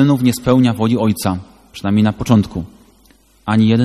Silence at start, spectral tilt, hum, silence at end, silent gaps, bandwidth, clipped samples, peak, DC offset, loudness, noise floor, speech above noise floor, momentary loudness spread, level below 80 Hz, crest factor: 0 s; -7 dB/octave; none; 0 s; none; 13.5 kHz; under 0.1%; 0 dBFS; under 0.1%; -15 LUFS; -51 dBFS; 37 dB; 15 LU; -42 dBFS; 16 dB